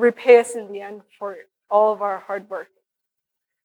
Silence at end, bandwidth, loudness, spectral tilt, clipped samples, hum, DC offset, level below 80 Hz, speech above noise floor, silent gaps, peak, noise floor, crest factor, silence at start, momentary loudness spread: 1 s; 11.5 kHz; -18 LUFS; -4 dB/octave; under 0.1%; none; under 0.1%; -82 dBFS; 63 dB; none; -2 dBFS; -83 dBFS; 20 dB; 0 s; 20 LU